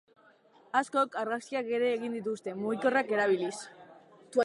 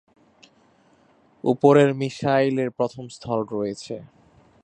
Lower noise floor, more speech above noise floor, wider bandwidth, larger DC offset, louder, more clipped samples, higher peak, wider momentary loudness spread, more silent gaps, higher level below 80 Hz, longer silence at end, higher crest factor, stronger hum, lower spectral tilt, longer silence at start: about the same, -61 dBFS vs -59 dBFS; second, 31 dB vs 37 dB; first, 11.5 kHz vs 9 kHz; neither; second, -31 LUFS vs -22 LUFS; neither; second, -12 dBFS vs -2 dBFS; second, 8 LU vs 18 LU; neither; second, -84 dBFS vs -64 dBFS; second, 0 s vs 0.6 s; about the same, 18 dB vs 22 dB; neither; second, -4.5 dB/octave vs -7 dB/octave; second, 0.75 s vs 1.45 s